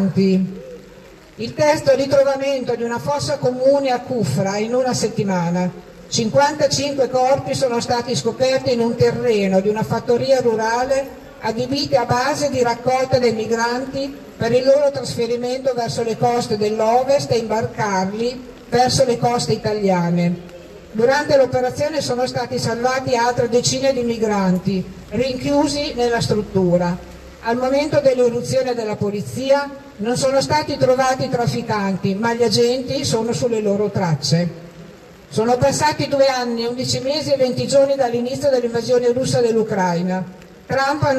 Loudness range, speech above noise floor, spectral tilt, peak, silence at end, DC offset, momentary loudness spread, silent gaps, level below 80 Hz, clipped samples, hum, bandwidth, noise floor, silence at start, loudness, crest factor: 2 LU; 24 dB; -5 dB/octave; -4 dBFS; 0 s; under 0.1%; 7 LU; none; -48 dBFS; under 0.1%; none; 13.5 kHz; -42 dBFS; 0 s; -18 LUFS; 16 dB